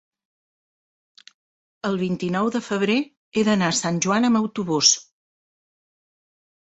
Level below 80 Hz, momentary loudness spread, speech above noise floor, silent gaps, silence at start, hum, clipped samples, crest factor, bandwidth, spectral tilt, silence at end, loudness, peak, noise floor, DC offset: -64 dBFS; 8 LU; over 69 dB; 3.17-3.32 s; 1.85 s; none; under 0.1%; 22 dB; 8.2 kHz; -3.5 dB/octave; 1.65 s; -21 LUFS; -2 dBFS; under -90 dBFS; under 0.1%